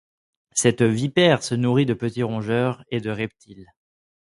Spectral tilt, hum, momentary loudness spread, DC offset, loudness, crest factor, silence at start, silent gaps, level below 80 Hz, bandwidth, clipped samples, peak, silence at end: -5 dB/octave; none; 10 LU; under 0.1%; -22 LUFS; 20 dB; 0.55 s; none; -58 dBFS; 11.5 kHz; under 0.1%; -4 dBFS; 0.75 s